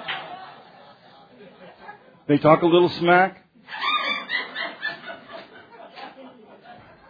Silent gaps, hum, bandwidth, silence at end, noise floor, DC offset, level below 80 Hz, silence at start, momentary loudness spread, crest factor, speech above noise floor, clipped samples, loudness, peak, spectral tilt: none; none; 5 kHz; 0.35 s; -50 dBFS; under 0.1%; -66 dBFS; 0 s; 27 LU; 24 dB; 33 dB; under 0.1%; -21 LUFS; 0 dBFS; -7.5 dB/octave